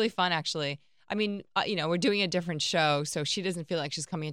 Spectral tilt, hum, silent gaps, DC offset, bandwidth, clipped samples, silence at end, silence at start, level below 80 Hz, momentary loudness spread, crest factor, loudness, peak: -4 dB/octave; none; none; under 0.1%; 16 kHz; under 0.1%; 0 s; 0 s; -74 dBFS; 7 LU; 18 dB; -29 LUFS; -12 dBFS